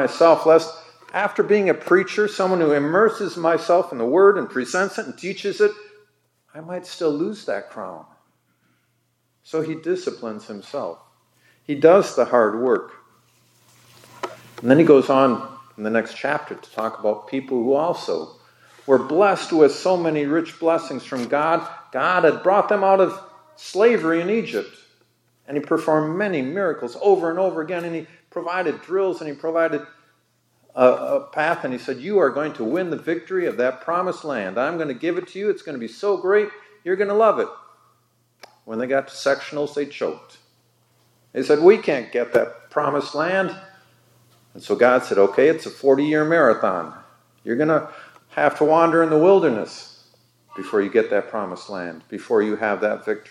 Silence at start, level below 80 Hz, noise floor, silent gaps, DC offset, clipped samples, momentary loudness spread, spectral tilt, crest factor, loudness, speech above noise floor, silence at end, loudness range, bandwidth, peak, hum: 0 s; -78 dBFS; -68 dBFS; none; under 0.1%; under 0.1%; 16 LU; -6 dB/octave; 20 dB; -20 LUFS; 48 dB; 0.1 s; 7 LU; 12.5 kHz; 0 dBFS; none